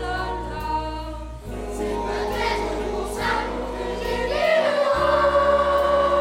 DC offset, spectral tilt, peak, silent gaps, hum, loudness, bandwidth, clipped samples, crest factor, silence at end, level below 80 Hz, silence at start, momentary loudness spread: under 0.1%; -5 dB/octave; -8 dBFS; none; none; -23 LUFS; 16 kHz; under 0.1%; 14 dB; 0 s; -36 dBFS; 0 s; 13 LU